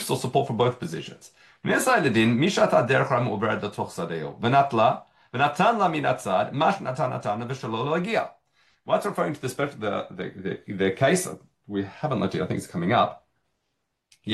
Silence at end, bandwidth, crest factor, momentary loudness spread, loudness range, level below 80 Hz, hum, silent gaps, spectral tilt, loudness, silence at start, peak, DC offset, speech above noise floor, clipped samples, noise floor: 0 s; 12.5 kHz; 18 dB; 13 LU; 5 LU; -64 dBFS; none; none; -5.5 dB/octave; -25 LUFS; 0 s; -8 dBFS; under 0.1%; 54 dB; under 0.1%; -78 dBFS